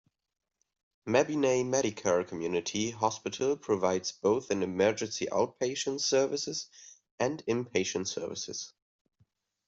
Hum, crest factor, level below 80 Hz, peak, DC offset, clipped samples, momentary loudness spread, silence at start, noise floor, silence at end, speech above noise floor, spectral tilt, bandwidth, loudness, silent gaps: none; 20 dB; -72 dBFS; -12 dBFS; under 0.1%; under 0.1%; 9 LU; 1.05 s; -72 dBFS; 1 s; 42 dB; -3.5 dB/octave; 8 kHz; -31 LUFS; 7.11-7.18 s